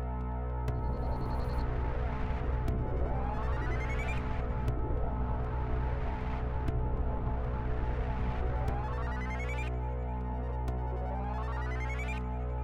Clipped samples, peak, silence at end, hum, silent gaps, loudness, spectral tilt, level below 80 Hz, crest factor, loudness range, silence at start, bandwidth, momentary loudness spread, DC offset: under 0.1%; -20 dBFS; 0 s; none; none; -35 LUFS; -8 dB/octave; -34 dBFS; 12 dB; 1 LU; 0 s; 7.4 kHz; 2 LU; under 0.1%